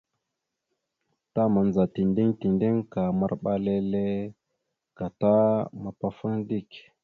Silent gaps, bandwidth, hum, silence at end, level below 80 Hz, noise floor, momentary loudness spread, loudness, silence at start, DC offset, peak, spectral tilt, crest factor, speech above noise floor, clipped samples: none; 4.6 kHz; none; 0.25 s; -58 dBFS; -84 dBFS; 11 LU; -26 LUFS; 1.35 s; under 0.1%; -10 dBFS; -10.5 dB/octave; 16 dB; 58 dB; under 0.1%